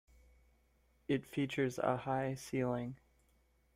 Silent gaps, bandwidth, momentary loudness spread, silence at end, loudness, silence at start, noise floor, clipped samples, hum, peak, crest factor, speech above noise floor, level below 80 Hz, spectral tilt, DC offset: none; 16 kHz; 11 LU; 0.8 s; -38 LUFS; 1.1 s; -73 dBFS; under 0.1%; none; -20 dBFS; 20 dB; 36 dB; -68 dBFS; -6.5 dB/octave; under 0.1%